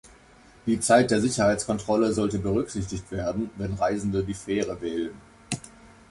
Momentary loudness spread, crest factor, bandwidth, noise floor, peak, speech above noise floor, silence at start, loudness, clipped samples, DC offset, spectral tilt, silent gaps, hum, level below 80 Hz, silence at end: 14 LU; 20 dB; 11.5 kHz; -53 dBFS; -6 dBFS; 28 dB; 0.05 s; -26 LUFS; under 0.1%; under 0.1%; -5 dB/octave; none; none; -48 dBFS; 0.25 s